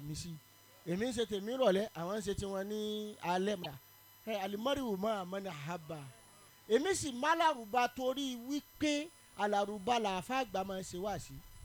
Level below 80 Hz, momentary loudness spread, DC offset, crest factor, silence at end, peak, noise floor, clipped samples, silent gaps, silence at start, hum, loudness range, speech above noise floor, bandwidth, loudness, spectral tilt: -62 dBFS; 13 LU; under 0.1%; 20 dB; 0 s; -16 dBFS; -61 dBFS; under 0.1%; none; 0 s; none; 4 LU; 24 dB; 19 kHz; -36 LUFS; -4.5 dB/octave